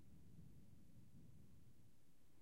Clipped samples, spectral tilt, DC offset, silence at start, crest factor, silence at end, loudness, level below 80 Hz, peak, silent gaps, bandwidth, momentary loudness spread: under 0.1%; -6.5 dB/octave; under 0.1%; 0 s; 14 dB; 0 s; -68 LUFS; -76 dBFS; -50 dBFS; none; 15.5 kHz; 3 LU